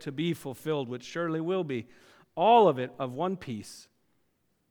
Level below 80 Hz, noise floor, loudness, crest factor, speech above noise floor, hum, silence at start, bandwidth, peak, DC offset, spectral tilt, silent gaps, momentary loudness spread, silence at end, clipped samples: -72 dBFS; -74 dBFS; -28 LUFS; 22 dB; 46 dB; none; 0 s; 18.5 kHz; -8 dBFS; under 0.1%; -6.5 dB/octave; none; 17 LU; 0.9 s; under 0.1%